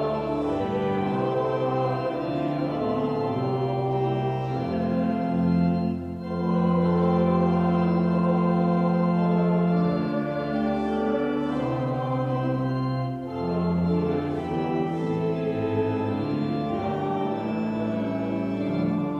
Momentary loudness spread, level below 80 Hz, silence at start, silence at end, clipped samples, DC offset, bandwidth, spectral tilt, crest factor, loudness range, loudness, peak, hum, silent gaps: 5 LU; -52 dBFS; 0 s; 0 s; under 0.1%; under 0.1%; 5.6 kHz; -9.5 dB/octave; 14 dB; 4 LU; -25 LUFS; -10 dBFS; none; none